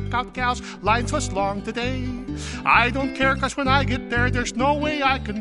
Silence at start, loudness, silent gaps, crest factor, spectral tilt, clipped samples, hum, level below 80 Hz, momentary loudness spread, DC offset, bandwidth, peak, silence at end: 0 s; -22 LUFS; none; 18 dB; -5 dB/octave; under 0.1%; none; -34 dBFS; 9 LU; under 0.1%; 11.5 kHz; -4 dBFS; 0 s